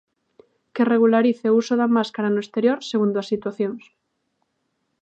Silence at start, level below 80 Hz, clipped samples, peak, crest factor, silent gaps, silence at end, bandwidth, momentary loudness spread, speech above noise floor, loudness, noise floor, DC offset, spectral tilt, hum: 0.75 s; -74 dBFS; under 0.1%; -6 dBFS; 16 dB; none; 1.25 s; 8 kHz; 10 LU; 53 dB; -21 LUFS; -73 dBFS; under 0.1%; -6.5 dB/octave; none